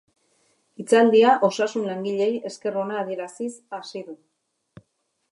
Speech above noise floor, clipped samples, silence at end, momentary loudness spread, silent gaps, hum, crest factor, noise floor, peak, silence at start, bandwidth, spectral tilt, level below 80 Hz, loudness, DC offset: 51 dB; under 0.1%; 1.15 s; 20 LU; none; none; 18 dB; -73 dBFS; -6 dBFS; 0.8 s; 11.5 kHz; -5 dB/octave; -78 dBFS; -22 LUFS; under 0.1%